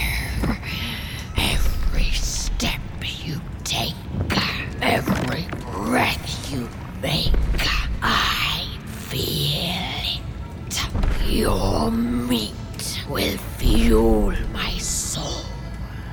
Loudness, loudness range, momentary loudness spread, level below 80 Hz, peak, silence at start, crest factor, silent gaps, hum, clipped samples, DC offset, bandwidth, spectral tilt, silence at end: -23 LUFS; 3 LU; 10 LU; -26 dBFS; -4 dBFS; 0 s; 18 dB; none; none; under 0.1%; under 0.1%; over 20 kHz; -4 dB/octave; 0 s